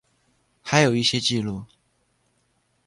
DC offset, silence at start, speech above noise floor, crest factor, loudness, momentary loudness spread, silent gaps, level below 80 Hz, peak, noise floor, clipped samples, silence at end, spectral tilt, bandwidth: under 0.1%; 0.65 s; 47 dB; 22 dB; -21 LUFS; 17 LU; none; -58 dBFS; -4 dBFS; -68 dBFS; under 0.1%; 1.2 s; -4 dB/octave; 11.5 kHz